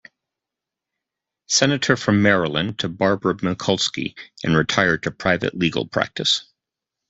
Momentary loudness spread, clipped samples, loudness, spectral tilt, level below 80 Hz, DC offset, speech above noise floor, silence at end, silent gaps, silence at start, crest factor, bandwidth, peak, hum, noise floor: 6 LU; under 0.1%; -20 LUFS; -4 dB/octave; -54 dBFS; under 0.1%; 65 dB; 0.65 s; none; 1.5 s; 20 dB; 8.4 kHz; -2 dBFS; none; -86 dBFS